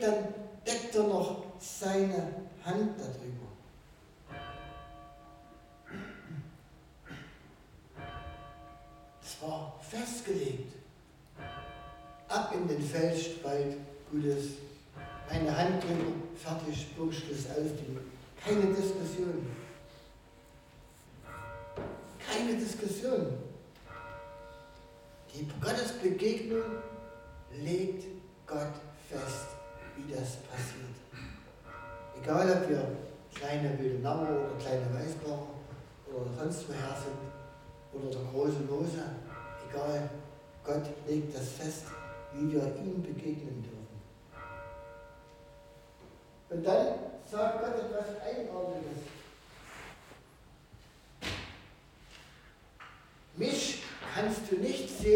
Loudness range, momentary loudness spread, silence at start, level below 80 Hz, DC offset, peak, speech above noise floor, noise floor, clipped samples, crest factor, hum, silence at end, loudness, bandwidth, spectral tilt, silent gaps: 12 LU; 21 LU; 0 s; -58 dBFS; under 0.1%; -14 dBFS; 25 dB; -58 dBFS; under 0.1%; 24 dB; none; 0 s; -36 LUFS; 17 kHz; -5.5 dB/octave; none